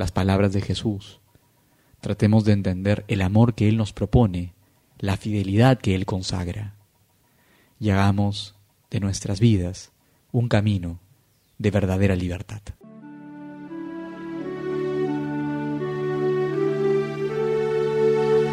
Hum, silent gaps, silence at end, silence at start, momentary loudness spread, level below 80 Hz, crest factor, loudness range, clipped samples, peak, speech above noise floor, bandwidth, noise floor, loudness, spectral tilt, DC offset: none; none; 0 s; 0 s; 17 LU; -46 dBFS; 20 dB; 6 LU; under 0.1%; -4 dBFS; 41 dB; 12.5 kHz; -62 dBFS; -23 LUFS; -7 dB/octave; under 0.1%